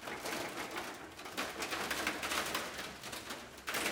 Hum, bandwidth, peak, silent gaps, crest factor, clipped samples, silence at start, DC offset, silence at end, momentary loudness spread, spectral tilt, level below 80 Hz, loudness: none; 18 kHz; -18 dBFS; none; 22 dB; under 0.1%; 0 s; under 0.1%; 0 s; 8 LU; -1.5 dB/octave; -66 dBFS; -39 LUFS